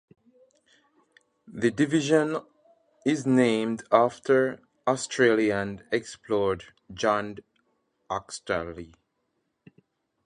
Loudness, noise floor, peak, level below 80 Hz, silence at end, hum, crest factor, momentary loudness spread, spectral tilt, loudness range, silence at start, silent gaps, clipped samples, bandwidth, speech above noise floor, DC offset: -26 LUFS; -76 dBFS; -4 dBFS; -60 dBFS; 1.4 s; none; 24 dB; 13 LU; -5 dB/octave; 8 LU; 1.5 s; none; under 0.1%; 11 kHz; 51 dB; under 0.1%